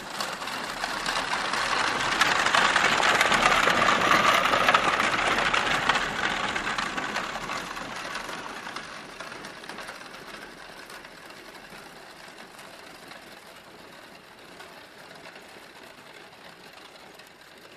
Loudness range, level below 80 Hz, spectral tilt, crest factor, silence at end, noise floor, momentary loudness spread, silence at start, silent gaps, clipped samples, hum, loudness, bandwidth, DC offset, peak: 24 LU; -54 dBFS; -2 dB/octave; 24 dB; 0 s; -49 dBFS; 25 LU; 0 s; none; under 0.1%; none; -24 LUFS; 14 kHz; under 0.1%; -4 dBFS